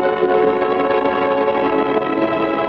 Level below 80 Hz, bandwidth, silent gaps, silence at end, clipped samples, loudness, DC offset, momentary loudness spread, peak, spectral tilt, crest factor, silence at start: -50 dBFS; 5.8 kHz; none; 0 s; under 0.1%; -17 LUFS; under 0.1%; 2 LU; -4 dBFS; -7.5 dB/octave; 12 dB; 0 s